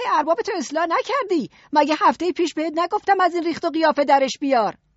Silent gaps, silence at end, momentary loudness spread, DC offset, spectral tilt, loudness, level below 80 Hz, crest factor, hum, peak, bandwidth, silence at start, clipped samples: none; 0.25 s; 6 LU; under 0.1%; -1.5 dB/octave; -20 LUFS; -66 dBFS; 16 dB; none; -4 dBFS; 8 kHz; 0 s; under 0.1%